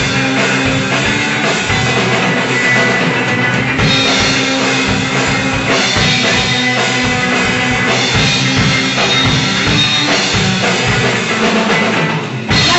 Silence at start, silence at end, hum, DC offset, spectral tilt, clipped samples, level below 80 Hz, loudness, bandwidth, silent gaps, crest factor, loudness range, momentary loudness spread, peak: 0 s; 0 s; none; under 0.1%; -3.5 dB/octave; under 0.1%; -34 dBFS; -11 LUFS; 8.4 kHz; none; 10 dB; 1 LU; 3 LU; -2 dBFS